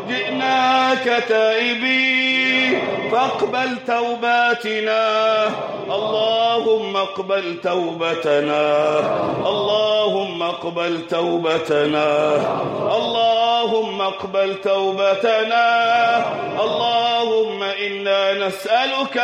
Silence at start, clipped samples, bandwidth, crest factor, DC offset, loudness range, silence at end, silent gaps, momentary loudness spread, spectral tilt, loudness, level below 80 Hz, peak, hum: 0 s; under 0.1%; 12 kHz; 12 dB; under 0.1%; 2 LU; 0 s; none; 6 LU; -4 dB/octave; -18 LUFS; -66 dBFS; -6 dBFS; none